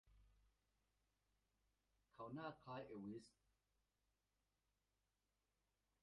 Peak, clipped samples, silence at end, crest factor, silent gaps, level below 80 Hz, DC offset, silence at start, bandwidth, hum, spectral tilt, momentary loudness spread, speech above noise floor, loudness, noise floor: -38 dBFS; under 0.1%; 2.75 s; 24 dB; none; -84 dBFS; under 0.1%; 0.05 s; 5.8 kHz; none; -5.5 dB/octave; 6 LU; over 35 dB; -56 LUFS; under -90 dBFS